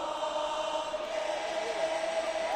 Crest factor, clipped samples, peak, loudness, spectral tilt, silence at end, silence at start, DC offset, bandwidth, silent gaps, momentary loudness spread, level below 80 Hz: 12 dB; under 0.1%; -20 dBFS; -33 LUFS; -1.5 dB/octave; 0 s; 0 s; under 0.1%; 12.5 kHz; none; 2 LU; -64 dBFS